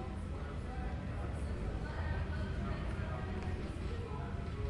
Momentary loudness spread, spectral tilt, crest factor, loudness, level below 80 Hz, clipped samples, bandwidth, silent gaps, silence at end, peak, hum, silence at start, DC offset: 3 LU; -7.5 dB/octave; 12 dB; -41 LUFS; -44 dBFS; under 0.1%; 11 kHz; none; 0 s; -26 dBFS; none; 0 s; under 0.1%